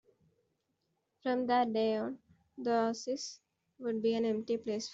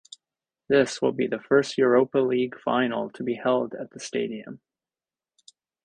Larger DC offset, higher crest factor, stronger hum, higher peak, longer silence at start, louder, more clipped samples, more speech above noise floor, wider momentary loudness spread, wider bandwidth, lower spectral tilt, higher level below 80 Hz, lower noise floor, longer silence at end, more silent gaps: neither; about the same, 18 dB vs 18 dB; neither; second, -18 dBFS vs -6 dBFS; first, 1.25 s vs 0.7 s; second, -34 LUFS vs -24 LUFS; neither; second, 48 dB vs over 66 dB; about the same, 11 LU vs 12 LU; second, 8 kHz vs 10 kHz; about the same, -4.5 dB/octave vs -5 dB/octave; second, -80 dBFS vs -68 dBFS; second, -81 dBFS vs under -90 dBFS; second, 0 s vs 1.3 s; neither